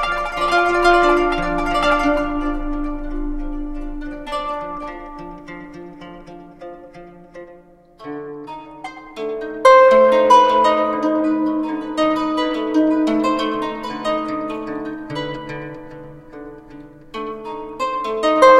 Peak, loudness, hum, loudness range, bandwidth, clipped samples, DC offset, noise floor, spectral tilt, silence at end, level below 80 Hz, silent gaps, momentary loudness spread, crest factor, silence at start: 0 dBFS; -18 LUFS; none; 20 LU; 12 kHz; under 0.1%; under 0.1%; -46 dBFS; -5 dB/octave; 0 s; -34 dBFS; none; 25 LU; 18 dB; 0 s